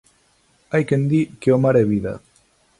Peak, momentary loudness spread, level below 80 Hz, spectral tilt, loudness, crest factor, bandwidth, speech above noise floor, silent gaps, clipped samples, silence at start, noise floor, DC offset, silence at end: -4 dBFS; 10 LU; -52 dBFS; -8.5 dB/octave; -19 LUFS; 16 dB; 11.5 kHz; 42 dB; none; under 0.1%; 0.7 s; -60 dBFS; under 0.1%; 0.65 s